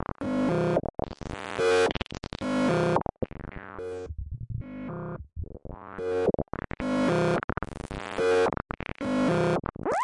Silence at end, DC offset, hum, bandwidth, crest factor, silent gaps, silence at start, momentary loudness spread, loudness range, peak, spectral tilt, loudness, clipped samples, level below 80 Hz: 0 s; under 0.1%; none; 11.5 kHz; 20 dB; 7.44-7.48 s; 0.2 s; 14 LU; 7 LU; -8 dBFS; -6.5 dB/octave; -29 LUFS; under 0.1%; -46 dBFS